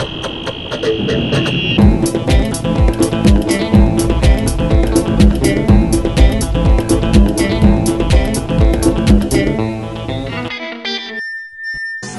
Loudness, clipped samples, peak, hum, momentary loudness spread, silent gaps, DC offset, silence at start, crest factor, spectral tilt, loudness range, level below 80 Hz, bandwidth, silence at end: -14 LUFS; under 0.1%; 0 dBFS; none; 10 LU; none; 0.9%; 0 s; 12 dB; -6 dB/octave; 4 LU; -18 dBFS; 12 kHz; 0 s